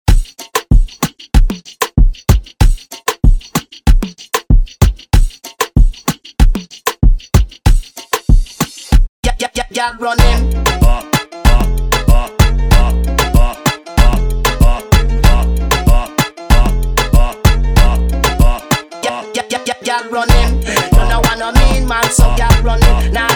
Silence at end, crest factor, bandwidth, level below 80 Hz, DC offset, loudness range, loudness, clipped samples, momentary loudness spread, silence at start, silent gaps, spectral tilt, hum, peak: 0 s; 10 dB; 18.5 kHz; -12 dBFS; under 0.1%; 3 LU; -14 LUFS; 0.1%; 7 LU; 0.05 s; 9.09-9.23 s; -5 dB/octave; none; 0 dBFS